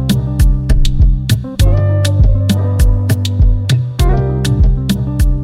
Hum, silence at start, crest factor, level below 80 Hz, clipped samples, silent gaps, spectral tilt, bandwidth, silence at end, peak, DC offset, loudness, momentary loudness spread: none; 0 s; 10 dB; -14 dBFS; under 0.1%; none; -6.5 dB/octave; 15.5 kHz; 0 s; 0 dBFS; under 0.1%; -13 LUFS; 3 LU